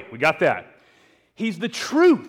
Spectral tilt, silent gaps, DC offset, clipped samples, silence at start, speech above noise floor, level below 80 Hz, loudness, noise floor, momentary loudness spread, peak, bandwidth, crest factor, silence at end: -5 dB/octave; none; under 0.1%; under 0.1%; 0 s; 38 dB; -66 dBFS; -22 LUFS; -58 dBFS; 11 LU; -8 dBFS; 13.5 kHz; 14 dB; 0 s